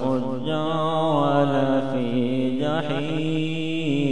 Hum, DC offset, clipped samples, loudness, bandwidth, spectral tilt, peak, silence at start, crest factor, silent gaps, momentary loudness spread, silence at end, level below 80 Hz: none; 2%; under 0.1%; -23 LUFS; 10 kHz; -7.5 dB/octave; -8 dBFS; 0 s; 14 dB; none; 5 LU; 0 s; -60 dBFS